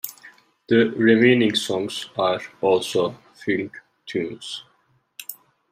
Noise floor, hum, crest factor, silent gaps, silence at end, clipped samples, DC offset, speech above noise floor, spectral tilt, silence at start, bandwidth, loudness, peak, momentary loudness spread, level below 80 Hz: -64 dBFS; none; 20 dB; none; 0.4 s; under 0.1%; under 0.1%; 43 dB; -5 dB/octave; 0.05 s; 16 kHz; -21 LUFS; -2 dBFS; 20 LU; -68 dBFS